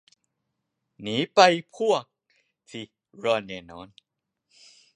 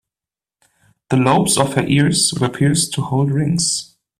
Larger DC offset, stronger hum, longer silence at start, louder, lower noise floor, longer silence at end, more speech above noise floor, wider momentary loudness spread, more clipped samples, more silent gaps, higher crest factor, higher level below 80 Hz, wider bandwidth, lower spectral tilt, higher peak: neither; neither; about the same, 1 s vs 1.1 s; second, -23 LUFS vs -16 LUFS; second, -80 dBFS vs -90 dBFS; first, 1.1 s vs 0.35 s; second, 56 dB vs 74 dB; first, 25 LU vs 5 LU; neither; neither; first, 26 dB vs 18 dB; second, -70 dBFS vs -48 dBFS; second, 10.5 kHz vs 15.5 kHz; about the same, -4 dB/octave vs -4.5 dB/octave; about the same, -2 dBFS vs 0 dBFS